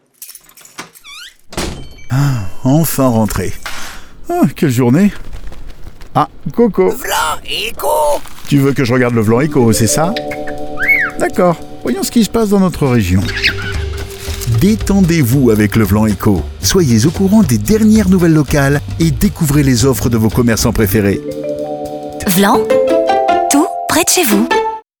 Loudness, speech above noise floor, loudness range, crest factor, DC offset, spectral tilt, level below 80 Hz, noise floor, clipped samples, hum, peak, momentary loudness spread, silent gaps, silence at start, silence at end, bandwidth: -13 LUFS; 26 dB; 5 LU; 12 dB; under 0.1%; -5.5 dB/octave; -30 dBFS; -38 dBFS; under 0.1%; none; 0 dBFS; 14 LU; none; 0.2 s; 0.2 s; over 20 kHz